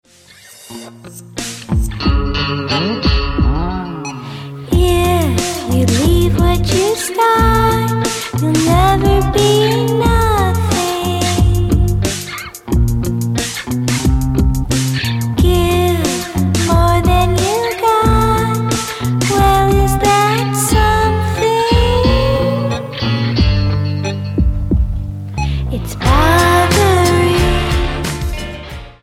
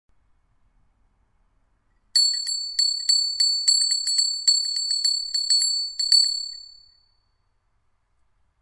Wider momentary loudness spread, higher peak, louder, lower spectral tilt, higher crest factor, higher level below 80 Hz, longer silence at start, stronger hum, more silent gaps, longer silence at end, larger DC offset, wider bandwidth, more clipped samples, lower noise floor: first, 10 LU vs 6 LU; first, 0 dBFS vs -6 dBFS; first, -14 LUFS vs -19 LUFS; first, -5.5 dB/octave vs 6.5 dB/octave; second, 14 dB vs 20 dB; first, -20 dBFS vs -66 dBFS; second, 0.5 s vs 2.15 s; neither; neither; second, 0.1 s vs 2 s; neither; first, 16.5 kHz vs 11.5 kHz; neither; second, -42 dBFS vs -68 dBFS